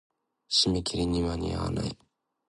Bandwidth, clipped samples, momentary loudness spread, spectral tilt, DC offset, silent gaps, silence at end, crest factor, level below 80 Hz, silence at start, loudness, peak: 11.5 kHz; under 0.1%; 11 LU; -4.5 dB/octave; under 0.1%; none; 0.55 s; 20 dB; -44 dBFS; 0.5 s; -28 LUFS; -12 dBFS